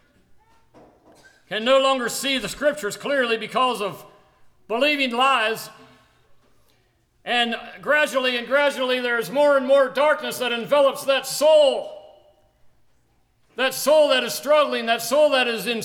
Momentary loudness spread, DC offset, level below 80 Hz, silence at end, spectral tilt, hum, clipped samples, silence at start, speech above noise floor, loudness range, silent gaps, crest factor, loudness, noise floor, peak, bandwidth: 11 LU; under 0.1%; -64 dBFS; 0 s; -2 dB/octave; none; under 0.1%; 1.5 s; 43 dB; 5 LU; none; 16 dB; -20 LUFS; -63 dBFS; -6 dBFS; 18.5 kHz